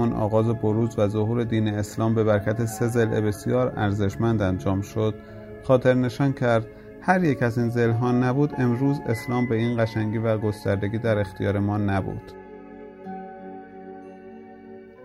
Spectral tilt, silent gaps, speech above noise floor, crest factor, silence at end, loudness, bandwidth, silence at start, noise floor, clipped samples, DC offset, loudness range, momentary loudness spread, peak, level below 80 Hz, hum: -7.5 dB/octave; none; 21 dB; 18 dB; 0 s; -24 LUFS; 15 kHz; 0 s; -43 dBFS; under 0.1%; under 0.1%; 6 LU; 19 LU; -6 dBFS; -50 dBFS; none